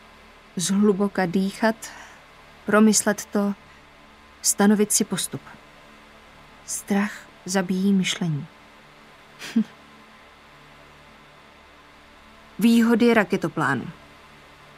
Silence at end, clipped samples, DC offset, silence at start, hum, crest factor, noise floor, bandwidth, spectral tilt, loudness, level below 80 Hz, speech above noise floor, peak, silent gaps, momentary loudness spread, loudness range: 0.85 s; under 0.1%; under 0.1%; 0.55 s; none; 22 dB; -50 dBFS; 16 kHz; -4.5 dB/octave; -22 LUFS; -60 dBFS; 28 dB; -2 dBFS; none; 20 LU; 13 LU